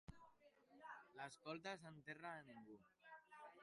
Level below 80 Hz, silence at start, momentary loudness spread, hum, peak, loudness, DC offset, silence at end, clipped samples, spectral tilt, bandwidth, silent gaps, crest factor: -78 dBFS; 0.1 s; 13 LU; none; -38 dBFS; -57 LUFS; under 0.1%; 0 s; under 0.1%; -4.5 dB/octave; 11 kHz; none; 20 dB